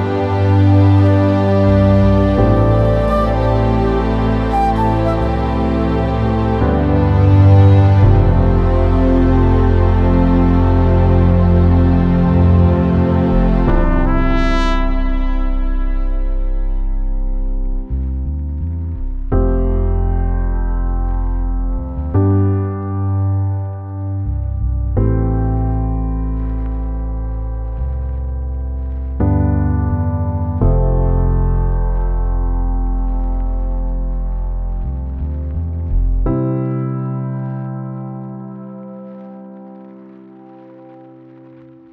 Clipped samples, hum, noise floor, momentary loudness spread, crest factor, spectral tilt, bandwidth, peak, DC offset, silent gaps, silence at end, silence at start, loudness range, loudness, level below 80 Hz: under 0.1%; none; -40 dBFS; 12 LU; 14 dB; -10 dB/octave; 5.6 kHz; 0 dBFS; under 0.1%; none; 0.9 s; 0 s; 10 LU; -16 LUFS; -18 dBFS